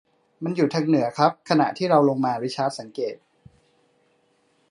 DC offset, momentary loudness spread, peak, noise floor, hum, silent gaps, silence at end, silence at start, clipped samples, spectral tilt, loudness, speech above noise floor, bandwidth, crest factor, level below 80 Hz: under 0.1%; 12 LU; -2 dBFS; -65 dBFS; none; none; 1.55 s; 0.4 s; under 0.1%; -6.5 dB/octave; -23 LUFS; 43 dB; 11 kHz; 22 dB; -72 dBFS